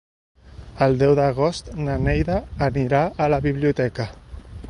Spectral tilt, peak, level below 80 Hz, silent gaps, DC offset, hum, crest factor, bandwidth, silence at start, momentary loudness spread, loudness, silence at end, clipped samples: -7.5 dB/octave; -4 dBFS; -36 dBFS; none; under 0.1%; none; 18 dB; 10.5 kHz; 0.45 s; 11 LU; -21 LUFS; 0 s; under 0.1%